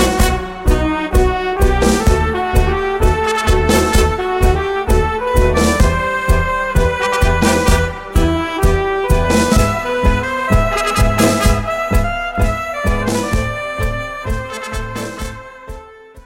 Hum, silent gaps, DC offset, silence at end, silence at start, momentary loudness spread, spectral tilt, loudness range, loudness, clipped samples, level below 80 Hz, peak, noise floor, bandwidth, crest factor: none; none; under 0.1%; 0.05 s; 0 s; 10 LU; -5 dB/octave; 5 LU; -16 LUFS; under 0.1%; -18 dBFS; 0 dBFS; -36 dBFS; 16.5 kHz; 14 dB